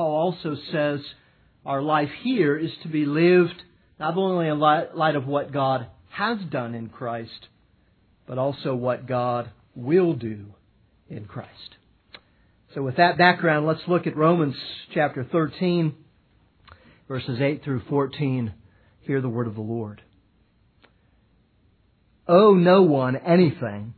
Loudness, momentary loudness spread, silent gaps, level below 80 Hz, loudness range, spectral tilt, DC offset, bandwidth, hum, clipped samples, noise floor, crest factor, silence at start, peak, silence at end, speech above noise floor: -23 LUFS; 19 LU; none; -64 dBFS; 8 LU; -10.5 dB/octave; under 0.1%; 4.6 kHz; none; under 0.1%; -62 dBFS; 20 dB; 0 s; -2 dBFS; 0.05 s; 40 dB